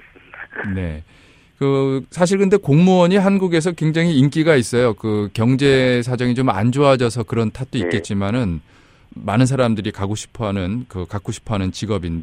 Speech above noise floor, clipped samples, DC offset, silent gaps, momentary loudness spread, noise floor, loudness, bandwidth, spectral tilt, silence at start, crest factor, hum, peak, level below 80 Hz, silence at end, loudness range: 22 dB; under 0.1%; under 0.1%; none; 12 LU; -39 dBFS; -18 LUFS; 12.5 kHz; -6.5 dB/octave; 0.35 s; 18 dB; none; 0 dBFS; -44 dBFS; 0 s; 6 LU